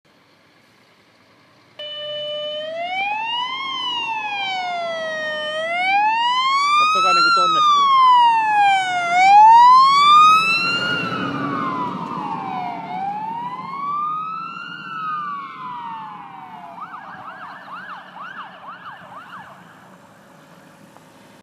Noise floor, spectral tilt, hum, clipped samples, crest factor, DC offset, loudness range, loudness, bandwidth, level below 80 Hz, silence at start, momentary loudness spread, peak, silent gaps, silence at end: -54 dBFS; -2.5 dB/octave; none; under 0.1%; 16 dB; under 0.1%; 23 LU; -16 LUFS; 13 kHz; -70 dBFS; 1.8 s; 24 LU; -4 dBFS; none; 1.9 s